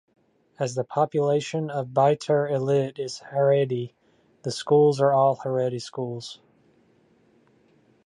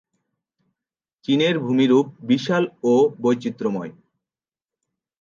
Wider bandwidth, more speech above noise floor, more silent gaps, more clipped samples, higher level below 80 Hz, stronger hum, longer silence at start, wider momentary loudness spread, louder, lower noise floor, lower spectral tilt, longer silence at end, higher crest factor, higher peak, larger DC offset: first, 11.5 kHz vs 7.4 kHz; second, 38 dB vs over 70 dB; neither; neither; about the same, -72 dBFS vs -72 dBFS; neither; second, 0.6 s vs 1.3 s; first, 13 LU vs 9 LU; second, -24 LUFS vs -20 LUFS; second, -61 dBFS vs under -90 dBFS; about the same, -6.5 dB/octave vs -6.5 dB/octave; first, 1.7 s vs 1.3 s; about the same, 18 dB vs 18 dB; second, -8 dBFS vs -4 dBFS; neither